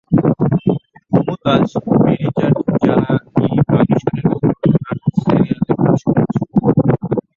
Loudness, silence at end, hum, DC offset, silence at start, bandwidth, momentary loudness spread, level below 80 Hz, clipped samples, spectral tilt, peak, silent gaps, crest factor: -15 LUFS; 0.15 s; none; under 0.1%; 0.1 s; 7 kHz; 4 LU; -44 dBFS; under 0.1%; -9.5 dB/octave; 0 dBFS; none; 14 dB